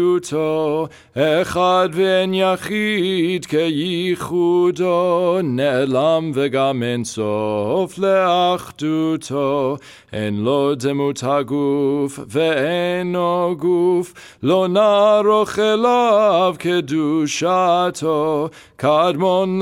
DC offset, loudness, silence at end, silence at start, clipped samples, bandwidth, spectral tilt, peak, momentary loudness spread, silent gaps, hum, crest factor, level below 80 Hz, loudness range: under 0.1%; -18 LUFS; 0 s; 0 s; under 0.1%; 16 kHz; -5.5 dB/octave; -4 dBFS; 7 LU; none; none; 14 dB; -58 dBFS; 4 LU